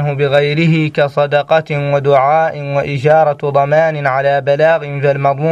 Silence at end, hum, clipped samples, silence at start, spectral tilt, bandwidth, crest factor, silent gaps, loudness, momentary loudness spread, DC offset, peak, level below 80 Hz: 0 s; none; under 0.1%; 0 s; -7.5 dB/octave; 8 kHz; 12 dB; none; -13 LUFS; 4 LU; under 0.1%; 0 dBFS; -52 dBFS